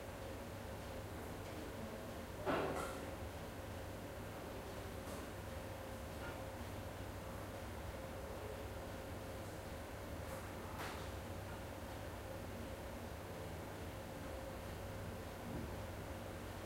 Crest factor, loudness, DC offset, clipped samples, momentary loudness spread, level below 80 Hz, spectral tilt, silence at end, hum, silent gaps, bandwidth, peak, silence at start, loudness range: 22 dB; -48 LUFS; under 0.1%; under 0.1%; 3 LU; -56 dBFS; -5.5 dB/octave; 0 s; none; none; 16 kHz; -26 dBFS; 0 s; 3 LU